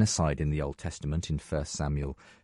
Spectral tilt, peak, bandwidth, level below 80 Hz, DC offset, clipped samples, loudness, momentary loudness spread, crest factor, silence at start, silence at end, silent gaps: -5 dB/octave; -12 dBFS; 11.5 kHz; -40 dBFS; under 0.1%; under 0.1%; -32 LUFS; 8 LU; 18 dB; 0 s; 0.15 s; none